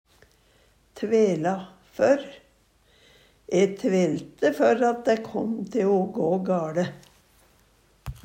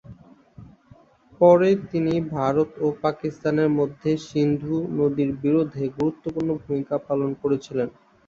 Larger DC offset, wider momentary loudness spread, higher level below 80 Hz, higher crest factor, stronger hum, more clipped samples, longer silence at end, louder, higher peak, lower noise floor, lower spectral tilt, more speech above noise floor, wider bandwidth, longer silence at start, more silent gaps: neither; first, 12 LU vs 9 LU; about the same, -56 dBFS vs -56 dBFS; about the same, 18 dB vs 20 dB; neither; neither; second, 0.1 s vs 0.4 s; about the same, -24 LUFS vs -23 LUFS; second, -8 dBFS vs -4 dBFS; first, -61 dBFS vs -53 dBFS; second, -6.5 dB/octave vs -8 dB/octave; first, 38 dB vs 31 dB; first, 16 kHz vs 7.6 kHz; first, 0.95 s vs 0.1 s; neither